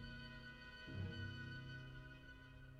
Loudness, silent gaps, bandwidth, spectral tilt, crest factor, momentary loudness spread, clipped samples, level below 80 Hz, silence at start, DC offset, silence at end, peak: -53 LUFS; none; 10 kHz; -6 dB/octave; 16 dB; 10 LU; under 0.1%; -64 dBFS; 0 s; under 0.1%; 0 s; -36 dBFS